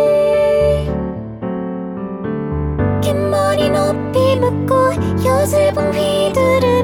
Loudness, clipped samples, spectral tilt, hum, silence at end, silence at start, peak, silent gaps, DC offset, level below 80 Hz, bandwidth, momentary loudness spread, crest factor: -16 LUFS; under 0.1%; -6.5 dB/octave; none; 0 s; 0 s; -2 dBFS; none; under 0.1%; -32 dBFS; 18 kHz; 11 LU; 12 dB